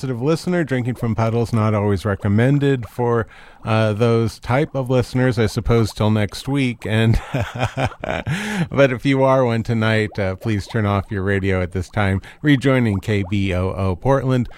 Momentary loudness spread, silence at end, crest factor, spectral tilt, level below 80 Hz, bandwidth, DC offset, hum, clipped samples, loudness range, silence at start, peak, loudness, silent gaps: 6 LU; 0 s; 18 dB; -7 dB/octave; -38 dBFS; 14 kHz; under 0.1%; none; under 0.1%; 1 LU; 0 s; -2 dBFS; -19 LUFS; none